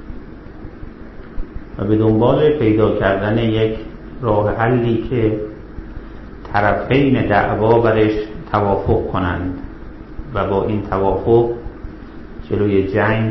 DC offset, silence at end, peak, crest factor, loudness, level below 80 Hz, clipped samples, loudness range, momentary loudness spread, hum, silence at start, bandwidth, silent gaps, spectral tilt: under 0.1%; 0 s; -2 dBFS; 16 dB; -17 LUFS; -32 dBFS; under 0.1%; 4 LU; 21 LU; none; 0 s; 6 kHz; none; -10 dB/octave